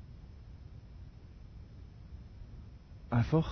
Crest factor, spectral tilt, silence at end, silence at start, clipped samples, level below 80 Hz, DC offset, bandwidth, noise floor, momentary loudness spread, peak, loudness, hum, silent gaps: 20 dB; -8 dB/octave; 0 s; 0 s; under 0.1%; -50 dBFS; under 0.1%; 6.4 kHz; -51 dBFS; 21 LU; -18 dBFS; -32 LUFS; none; none